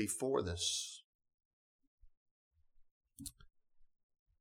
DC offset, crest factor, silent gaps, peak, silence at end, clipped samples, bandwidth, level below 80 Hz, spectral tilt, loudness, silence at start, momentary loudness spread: under 0.1%; 22 dB; 1.04-1.19 s, 1.34-1.38 s, 1.45-1.79 s, 1.87-1.98 s, 2.17-2.51 s, 2.91-3.01 s; -22 dBFS; 0.55 s; under 0.1%; 19.5 kHz; -66 dBFS; -3 dB/octave; -38 LUFS; 0 s; 15 LU